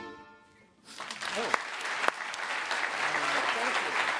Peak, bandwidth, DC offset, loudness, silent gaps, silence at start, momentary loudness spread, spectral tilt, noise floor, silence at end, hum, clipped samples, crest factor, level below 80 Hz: -6 dBFS; 11 kHz; under 0.1%; -30 LUFS; none; 0 s; 14 LU; -1 dB/octave; -60 dBFS; 0 s; none; under 0.1%; 28 dB; -76 dBFS